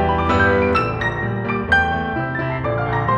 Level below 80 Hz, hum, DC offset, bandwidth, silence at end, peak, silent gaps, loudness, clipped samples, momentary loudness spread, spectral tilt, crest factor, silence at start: -34 dBFS; none; under 0.1%; 9 kHz; 0 s; -4 dBFS; none; -19 LUFS; under 0.1%; 7 LU; -7.5 dB/octave; 16 dB; 0 s